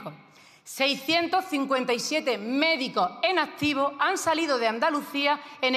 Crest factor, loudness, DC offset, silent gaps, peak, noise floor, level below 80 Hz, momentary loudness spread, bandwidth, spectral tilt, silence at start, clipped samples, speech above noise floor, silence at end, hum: 18 dB; -25 LUFS; under 0.1%; none; -8 dBFS; -54 dBFS; -70 dBFS; 3 LU; 14.5 kHz; -2.5 dB/octave; 0 s; under 0.1%; 28 dB; 0 s; none